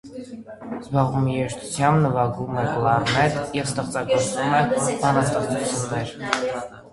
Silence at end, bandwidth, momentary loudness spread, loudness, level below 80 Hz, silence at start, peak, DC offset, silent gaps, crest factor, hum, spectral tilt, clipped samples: 0.05 s; 11.5 kHz; 11 LU; -22 LUFS; -50 dBFS; 0.05 s; 0 dBFS; under 0.1%; none; 22 dB; none; -5 dB/octave; under 0.1%